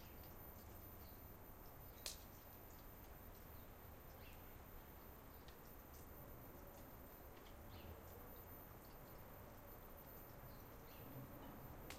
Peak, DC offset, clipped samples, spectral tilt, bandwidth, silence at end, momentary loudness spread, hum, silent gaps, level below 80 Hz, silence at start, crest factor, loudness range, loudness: -30 dBFS; under 0.1%; under 0.1%; -4.5 dB/octave; 16 kHz; 0 s; 3 LU; none; none; -64 dBFS; 0 s; 28 dB; 2 LU; -58 LUFS